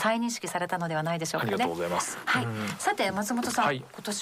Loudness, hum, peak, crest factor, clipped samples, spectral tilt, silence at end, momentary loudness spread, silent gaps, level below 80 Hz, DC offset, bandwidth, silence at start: -29 LUFS; none; -14 dBFS; 16 dB; under 0.1%; -4 dB/octave; 0 s; 4 LU; none; -68 dBFS; under 0.1%; 16 kHz; 0 s